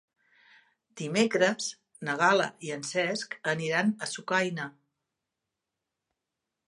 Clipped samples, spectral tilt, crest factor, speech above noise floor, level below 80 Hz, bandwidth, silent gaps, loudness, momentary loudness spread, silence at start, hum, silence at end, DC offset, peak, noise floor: under 0.1%; -4 dB/octave; 22 dB; 58 dB; -80 dBFS; 11.5 kHz; none; -28 LUFS; 12 LU; 0.95 s; none; 2 s; under 0.1%; -10 dBFS; -87 dBFS